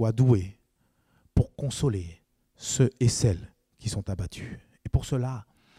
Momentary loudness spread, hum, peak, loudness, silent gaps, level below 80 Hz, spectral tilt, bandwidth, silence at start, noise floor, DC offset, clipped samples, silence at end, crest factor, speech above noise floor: 17 LU; none; -10 dBFS; -28 LUFS; none; -42 dBFS; -6 dB/octave; 13.5 kHz; 0 s; -70 dBFS; under 0.1%; under 0.1%; 0.35 s; 18 dB; 44 dB